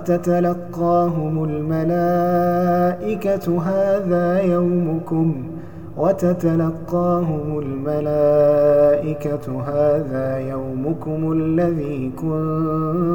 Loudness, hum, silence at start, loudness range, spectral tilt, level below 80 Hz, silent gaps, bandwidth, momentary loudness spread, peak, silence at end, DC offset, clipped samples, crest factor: -19 LUFS; none; 0 s; 3 LU; -9.5 dB/octave; -48 dBFS; none; 17.5 kHz; 9 LU; -6 dBFS; 0 s; 1%; under 0.1%; 12 dB